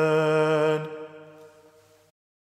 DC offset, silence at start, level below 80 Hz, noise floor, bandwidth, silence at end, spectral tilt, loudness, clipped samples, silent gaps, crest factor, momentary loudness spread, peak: under 0.1%; 0 s; -82 dBFS; -57 dBFS; 13 kHz; 1.15 s; -6.5 dB/octave; -23 LUFS; under 0.1%; none; 16 dB; 21 LU; -10 dBFS